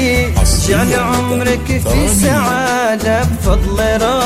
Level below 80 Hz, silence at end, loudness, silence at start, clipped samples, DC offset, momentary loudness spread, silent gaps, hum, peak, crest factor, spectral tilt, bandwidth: -20 dBFS; 0 s; -13 LUFS; 0 s; under 0.1%; under 0.1%; 3 LU; none; none; 0 dBFS; 12 dB; -4.5 dB/octave; 16 kHz